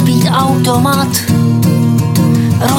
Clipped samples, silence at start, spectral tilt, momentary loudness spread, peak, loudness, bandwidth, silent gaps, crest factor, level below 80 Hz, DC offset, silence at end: under 0.1%; 0 s; -6 dB/octave; 1 LU; 0 dBFS; -11 LUFS; 17 kHz; none; 10 dB; -40 dBFS; under 0.1%; 0 s